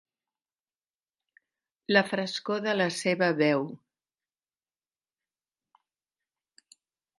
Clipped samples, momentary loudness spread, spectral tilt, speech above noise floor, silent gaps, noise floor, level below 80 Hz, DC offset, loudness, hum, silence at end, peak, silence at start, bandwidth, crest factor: under 0.1%; 7 LU; -4.5 dB/octave; over 63 dB; none; under -90 dBFS; -82 dBFS; under 0.1%; -27 LUFS; none; 3.4 s; -6 dBFS; 1.9 s; 11.5 kHz; 26 dB